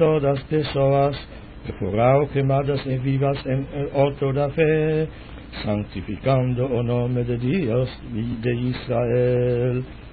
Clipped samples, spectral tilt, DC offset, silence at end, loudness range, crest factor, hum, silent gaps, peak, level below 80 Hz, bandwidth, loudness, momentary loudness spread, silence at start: under 0.1%; -12.5 dB/octave; under 0.1%; 0 s; 2 LU; 16 dB; none; none; -6 dBFS; -42 dBFS; 4.8 kHz; -22 LUFS; 11 LU; 0 s